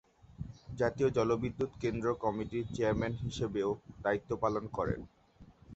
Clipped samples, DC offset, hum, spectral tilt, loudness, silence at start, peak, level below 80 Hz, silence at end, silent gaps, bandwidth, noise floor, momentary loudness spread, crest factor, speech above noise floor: under 0.1%; under 0.1%; none; -7 dB/octave; -34 LUFS; 0.3 s; -16 dBFS; -54 dBFS; 0 s; none; 8.2 kHz; -59 dBFS; 11 LU; 18 dB; 25 dB